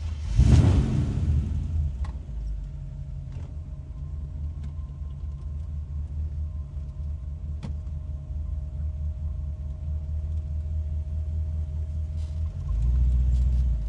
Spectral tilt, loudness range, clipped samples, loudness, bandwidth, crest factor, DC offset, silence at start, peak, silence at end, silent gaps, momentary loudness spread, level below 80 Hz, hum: -8 dB/octave; 9 LU; under 0.1%; -29 LUFS; 9 kHz; 20 dB; under 0.1%; 0 s; -6 dBFS; 0 s; none; 13 LU; -30 dBFS; none